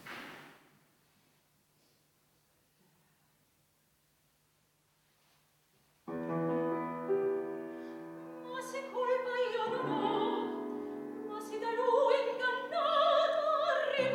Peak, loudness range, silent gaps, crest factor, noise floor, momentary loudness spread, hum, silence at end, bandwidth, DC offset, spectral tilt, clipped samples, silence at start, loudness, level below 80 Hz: -18 dBFS; 10 LU; none; 18 dB; -73 dBFS; 17 LU; none; 0 s; 17.5 kHz; under 0.1%; -5 dB/octave; under 0.1%; 0 s; -33 LUFS; -86 dBFS